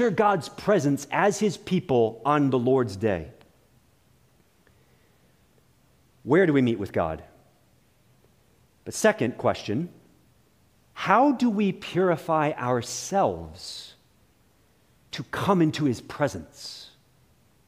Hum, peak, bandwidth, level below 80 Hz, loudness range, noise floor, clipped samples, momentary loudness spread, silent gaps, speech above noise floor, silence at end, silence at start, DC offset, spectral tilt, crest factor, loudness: none; -4 dBFS; 15.5 kHz; -58 dBFS; 5 LU; -63 dBFS; under 0.1%; 17 LU; none; 38 dB; 0.8 s; 0 s; under 0.1%; -5.5 dB/octave; 22 dB; -24 LUFS